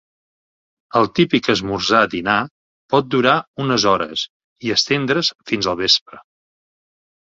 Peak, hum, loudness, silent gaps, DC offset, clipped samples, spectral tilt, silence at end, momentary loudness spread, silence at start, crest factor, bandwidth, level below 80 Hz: 0 dBFS; none; -17 LUFS; 2.51-2.89 s, 3.47-3.54 s, 4.30-4.56 s, 5.35-5.39 s, 6.01-6.06 s; under 0.1%; under 0.1%; -4 dB/octave; 1.05 s; 6 LU; 0.95 s; 18 dB; 7.8 kHz; -52 dBFS